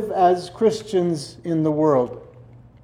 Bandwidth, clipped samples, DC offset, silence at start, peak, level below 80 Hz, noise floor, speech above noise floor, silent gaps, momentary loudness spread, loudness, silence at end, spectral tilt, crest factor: 12 kHz; under 0.1%; under 0.1%; 0 s; -6 dBFS; -56 dBFS; -46 dBFS; 26 dB; none; 10 LU; -21 LUFS; 0.4 s; -7 dB/octave; 16 dB